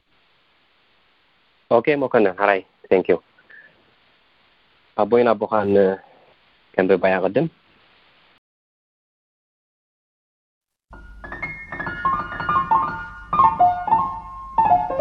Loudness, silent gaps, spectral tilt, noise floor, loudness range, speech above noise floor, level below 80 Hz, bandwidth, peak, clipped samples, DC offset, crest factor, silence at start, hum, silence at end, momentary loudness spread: -20 LUFS; 8.38-10.61 s; -8.5 dB/octave; -61 dBFS; 10 LU; 43 dB; -50 dBFS; 5.4 kHz; -2 dBFS; under 0.1%; under 0.1%; 22 dB; 1.7 s; none; 0 s; 13 LU